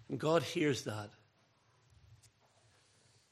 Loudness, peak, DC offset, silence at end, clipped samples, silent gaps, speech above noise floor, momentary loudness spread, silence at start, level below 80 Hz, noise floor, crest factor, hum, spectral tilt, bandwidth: -35 LUFS; -18 dBFS; under 0.1%; 1.15 s; under 0.1%; none; 37 dB; 14 LU; 0.1 s; -78 dBFS; -72 dBFS; 22 dB; none; -5 dB/octave; 14.5 kHz